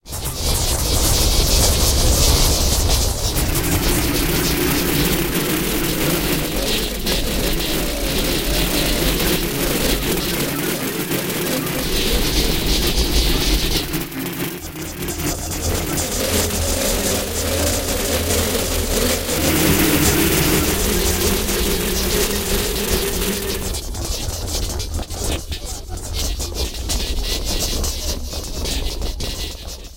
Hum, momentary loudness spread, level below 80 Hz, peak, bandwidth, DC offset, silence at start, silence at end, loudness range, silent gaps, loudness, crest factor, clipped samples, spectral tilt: none; 10 LU; -24 dBFS; -2 dBFS; 17 kHz; 0.7%; 0 s; 0 s; 7 LU; none; -19 LUFS; 16 dB; under 0.1%; -3.5 dB/octave